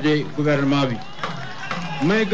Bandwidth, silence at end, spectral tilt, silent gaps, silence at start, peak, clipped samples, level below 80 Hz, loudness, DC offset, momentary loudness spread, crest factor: 8 kHz; 0 s; -6.5 dB/octave; none; 0 s; -10 dBFS; under 0.1%; -54 dBFS; -22 LUFS; 2%; 11 LU; 12 dB